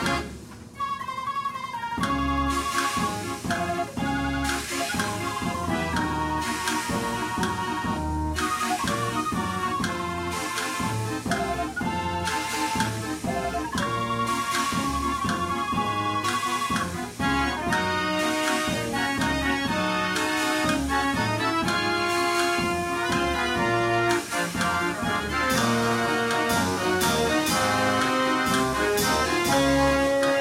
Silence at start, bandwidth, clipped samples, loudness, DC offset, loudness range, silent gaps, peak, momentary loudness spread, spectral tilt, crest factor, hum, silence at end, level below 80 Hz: 0 s; 16 kHz; under 0.1%; -25 LUFS; under 0.1%; 4 LU; none; -8 dBFS; 6 LU; -4 dB/octave; 16 dB; none; 0 s; -42 dBFS